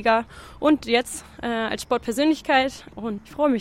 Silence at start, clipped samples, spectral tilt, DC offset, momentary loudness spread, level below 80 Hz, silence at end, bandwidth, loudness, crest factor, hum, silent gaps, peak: 0 s; under 0.1%; -3.5 dB/octave; under 0.1%; 12 LU; -50 dBFS; 0 s; 16 kHz; -23 LUFS; 18 dB; none; none; -6 dBFS